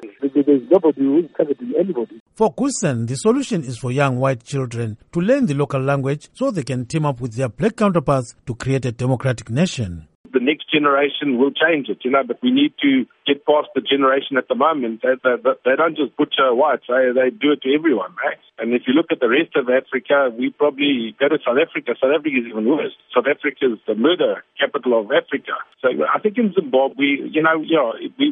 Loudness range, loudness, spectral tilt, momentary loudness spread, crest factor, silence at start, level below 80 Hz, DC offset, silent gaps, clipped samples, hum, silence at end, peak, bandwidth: 3 LU; -19 LUFS; -6 dB/octave; 7 LU; 16 dB; 0 s; -54 dBFS; under 0.1%; 2.20-2.26 s, 10.15-10.24 s; under 0.1%; none; 0 s; -2 dBFS; 11 kHz